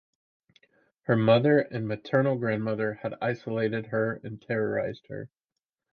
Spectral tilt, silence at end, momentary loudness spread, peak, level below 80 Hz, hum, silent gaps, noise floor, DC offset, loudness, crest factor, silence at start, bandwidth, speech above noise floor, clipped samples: -9 dB/octave; 0.65 s; 17 LU; -8 dBFS; -66 dBFS; none; none; -88 dBFS; under 0.1%; -27 LUFS; 20 dB; 1.1 s; 6.4 kHz; 61 dB; under 0.1%